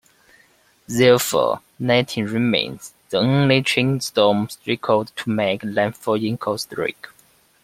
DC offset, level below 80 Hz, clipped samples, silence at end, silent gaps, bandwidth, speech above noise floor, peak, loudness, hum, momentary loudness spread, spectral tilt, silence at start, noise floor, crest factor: under 0.1%; -60 dBFS; under 0.1%; 0.6 s; none; 16.5 kHz; 37 dB; -2 dBFS; -20 LUFS; none; 10 LU; -5 dB/octave; 0.9 s; -57 dBFS; 18 dB